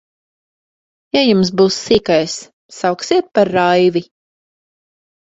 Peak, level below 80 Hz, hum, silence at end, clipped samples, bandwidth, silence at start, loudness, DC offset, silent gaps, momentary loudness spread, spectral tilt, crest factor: 0 dBFS; -50 dBFS; none; 1.2 s; under 0.1%; 8 kHz; 1.15 s; -15 LUFS; under 0.1%; 2.53-2.69 s; 8 LU; -5 dB/octave; 16 dB